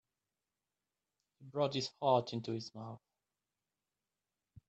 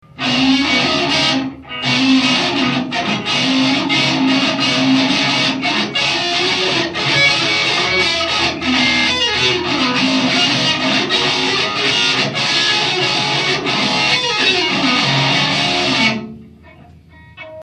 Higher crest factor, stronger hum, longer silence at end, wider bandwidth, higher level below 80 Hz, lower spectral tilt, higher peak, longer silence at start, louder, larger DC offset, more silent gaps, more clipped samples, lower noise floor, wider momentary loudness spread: first, 24 dB vs 14 dB; first, 50 Hz at -80 dBFS vs none; first, 1.7 s vs 0 s; second, 8.4 kHz vs 11 kHz; second, -80 dBFS vs -48 dBFS; first, -5.5 dB/octave vs -3 dB/octave; second, -18 dBFS vs 0 dBFS; first, 1.4 s vs 0.15 s; second, -37 LUFS vs -14 LUFS; neither; neither; neither; first, under -90 dBFS vs -42 dBFS; first, 17 LU vs 3 LU